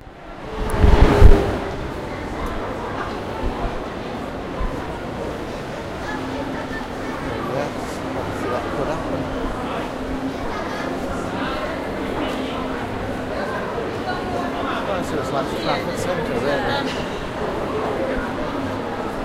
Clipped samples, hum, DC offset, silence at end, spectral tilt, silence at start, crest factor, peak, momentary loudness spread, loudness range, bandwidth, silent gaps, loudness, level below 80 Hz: under 0.1%; none; under 0.1%; 0 s; -6.5 dB/octave; 0 s; 22 dB; 0 dBFS; 8 LU; 8 LU; 14 kHz; none; -24 LUFS; -26 dBFS